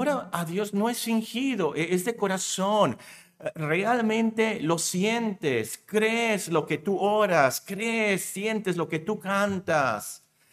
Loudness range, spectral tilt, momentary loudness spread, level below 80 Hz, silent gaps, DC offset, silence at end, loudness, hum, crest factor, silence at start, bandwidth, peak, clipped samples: 2 LU; -4.5 dB/octave; 6 LU; -72 dBFS; none; under 0.1%; 0.35 s; -26 LUFS; none; 20 dB; 0 s; 16 kHz; -6 dBFS; under 0.1%